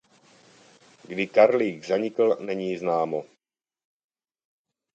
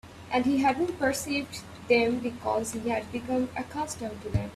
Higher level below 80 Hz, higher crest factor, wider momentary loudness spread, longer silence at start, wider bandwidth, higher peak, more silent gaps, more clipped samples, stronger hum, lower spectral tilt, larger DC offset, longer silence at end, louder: second, -74 dBFS vs -52 dBFS; about the same, 22 dB vs 18 dB; about the same, 11 LU vs 10 LU; first, 1.1 s vs 0.05 s; second, 8.4 kHz vs 15 kHz; first, -4 dBFS vs -10 dBFS; neither; neither; neither; about the same, -6 dB/octave vs -5 dB/octave; neither; first, 1.7 s vs 0 s; first, -24 LUFS vs -28 LUFS